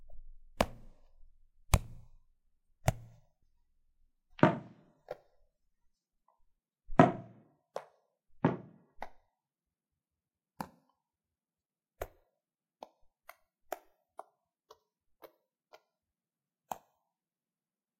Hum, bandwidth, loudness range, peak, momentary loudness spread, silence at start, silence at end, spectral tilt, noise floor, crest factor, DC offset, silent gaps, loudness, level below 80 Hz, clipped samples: none; 16 kHz; 20 LU; -4 dBFS; 27 LU; 0.1 s; 1.25 s; -6 dB/octave; under -90 dBFS; 36 dB; under 0.1%; none; -33 LUFS; -50 dBFS; under 0.1%